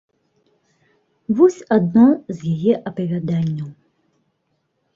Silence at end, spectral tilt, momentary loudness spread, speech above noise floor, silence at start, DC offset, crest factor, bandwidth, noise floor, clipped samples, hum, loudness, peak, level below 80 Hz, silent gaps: 1.25 s; -9 dB/octave; 12 LU; 53 dB; 1.3 s; under 0.1%; 18 dB; 7.4 kHz; -70 dBFS; under 0.1%; none; -18 LUFS; -2 dBFS; -60 dBFS; none